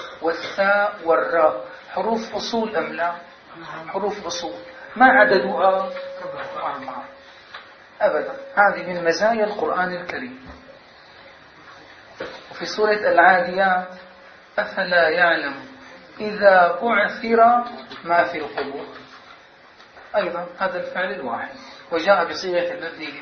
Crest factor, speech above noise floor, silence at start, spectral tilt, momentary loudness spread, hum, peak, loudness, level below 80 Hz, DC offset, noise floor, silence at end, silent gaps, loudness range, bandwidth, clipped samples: 22 dB; 28 dB; 0 s; -4 dB/octave; 20 LU; none; 0 dBFS; -20 LUFS; -62 dBFS; under 0.1%; -48 dBFS; 0 s; none; 8 LU; 6.6 kHz; under 0.1%